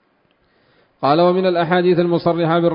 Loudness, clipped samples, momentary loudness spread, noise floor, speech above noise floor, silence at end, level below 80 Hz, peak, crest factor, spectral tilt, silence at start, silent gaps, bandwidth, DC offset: -16 LUFS; under 0.1%; 3 LU; -61 dBFS; 46 dB; 0 s; -58 dBFS; -2 dBFS; 16 dB; -12 dB/octave; 1 s; none; 5.4 kHz; under 0.1%